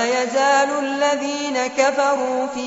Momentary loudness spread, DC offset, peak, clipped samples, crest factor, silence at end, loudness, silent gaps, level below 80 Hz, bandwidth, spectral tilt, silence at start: 6 LU; under 0.1%; -4 dBFS; under 0.1%; 16 dB; 0 s; -19 LUFS; none; -64 dBFS; 8 kHz; 0 dB/octave; 0 s